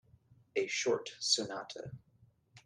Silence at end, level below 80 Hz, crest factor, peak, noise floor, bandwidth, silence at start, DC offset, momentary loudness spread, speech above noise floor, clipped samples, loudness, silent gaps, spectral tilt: 0.05 s; -76 dBFS; 22 dB; -16 dBFS; -68 dBFS; 12 kHz; 0.55 s; under 0.1%; 17 LU; 32 dB; under 0.1%; -34 LUFS; none; -2 dB/octave